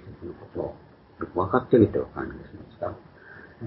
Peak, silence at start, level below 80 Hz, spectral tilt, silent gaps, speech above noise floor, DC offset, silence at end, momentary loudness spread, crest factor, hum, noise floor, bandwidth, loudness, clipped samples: -4 dBFS; 0.05 s; -50 dBFS; -12.5 dB/octave; none; 22 dB; under 0.1%; 0 s; 25 LU; 22 dB; none; -48 dBFS; 5.6 kHz; -26 LUFS; under 0.1%